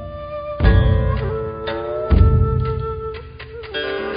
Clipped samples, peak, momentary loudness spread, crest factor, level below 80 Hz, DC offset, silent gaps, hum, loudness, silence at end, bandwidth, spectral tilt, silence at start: under 0.1%; 0 dBFS; 15 LU; 18 dB; -22 dBFS; under 0.1%; none; none; -20 LUFS; 0 s; 5.2 kHz; -12 dB/octave; 0 s